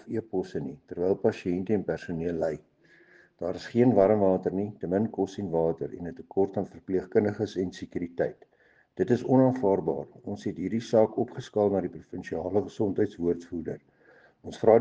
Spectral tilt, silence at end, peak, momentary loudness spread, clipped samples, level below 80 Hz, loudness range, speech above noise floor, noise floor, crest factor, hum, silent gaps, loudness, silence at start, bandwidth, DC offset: -8 dB/octave; 0 s; -6 dBFS; 14 LU; under 0.1%; -62 dBFS; 4 LU; 32 dB; -59 dBFS; 22 dB; none; none; -28 LUFS; 0.05 s; 8 kHz; under 0.1%